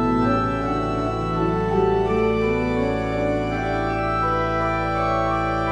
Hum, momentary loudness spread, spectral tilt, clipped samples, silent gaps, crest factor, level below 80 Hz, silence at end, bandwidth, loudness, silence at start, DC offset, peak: none; 3 LU; -7.5 dB/octave; under 0.1%; none; 14 dB; -34 dBFS; 0 s; 10 kHz; -22 LUFS; 0 s; under 0.1%; -8 dBFS